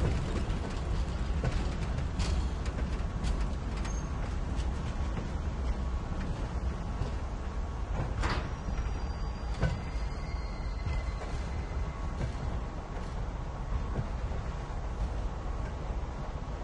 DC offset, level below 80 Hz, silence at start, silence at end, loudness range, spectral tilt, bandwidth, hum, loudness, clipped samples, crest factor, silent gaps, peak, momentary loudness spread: under 0.1%; -34 dBFS; 0 s; 0 s; 3 LU; -6.5 dB/octave; 10 kHz; none; -36 LUFS; under 0.1%; 16 dB; none; -16 dBFS; 5 LU